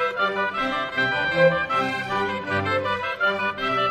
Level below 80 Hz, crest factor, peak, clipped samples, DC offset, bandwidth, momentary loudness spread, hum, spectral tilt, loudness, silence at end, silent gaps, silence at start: -54 dBFS; 18 dB; -6 dBFS; under 0.1%; under 0.1%; 13 kHz; 6 LU; none; -5.5 dB/octave; -23 LUFS; 0 s; none; 0 s